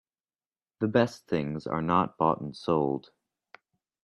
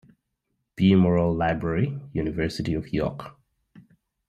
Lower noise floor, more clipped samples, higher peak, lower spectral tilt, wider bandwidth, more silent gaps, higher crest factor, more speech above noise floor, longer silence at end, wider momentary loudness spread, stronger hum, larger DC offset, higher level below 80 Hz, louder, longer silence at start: first, under -90 dBFS vs -78 dBFS; neither; about the same, -10 dBFS vs -8 dBFS; about the same, -7.5 dB/octave vs -8 dB/octave; first, 12 kHz vs 9.6 kHz; neither; about the same, 20 dB vs 18 dB; first, over 62 dB vs 55 dB; first, 1.05 s vs 0.5 s; second, 7 LU vs 11 LU; neither; neither; second, -64 dBFS vs -46 dBFS; second, -28 LUFS vs -24 LUFS; about the same, 0.8 s vs 0.8 s